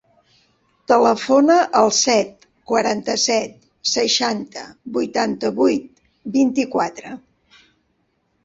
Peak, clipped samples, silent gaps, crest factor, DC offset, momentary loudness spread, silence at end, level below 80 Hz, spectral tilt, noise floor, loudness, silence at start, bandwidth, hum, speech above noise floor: -2 dBFS; under 0.1%; none; 18 dB; under 0.1%; 17 LU; 1.25 s; -62 dBFS; -2.5 dB/octave; -67 dBFS; -18 LUFS; 0.9 s; 8 kHz; none; 49 dB